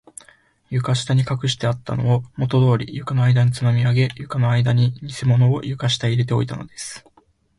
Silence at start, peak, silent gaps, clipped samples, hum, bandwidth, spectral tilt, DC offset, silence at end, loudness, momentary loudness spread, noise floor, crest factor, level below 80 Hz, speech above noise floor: 0.7 s; -6 dBFS; none; under 0.1%; none; 11.5 kHz; -6 dB/octave; under 0.1%; 0.6 s; -20 LUFS; 9 LU; -58 dBFS; 14 dB; -50 dBFS; 39 dB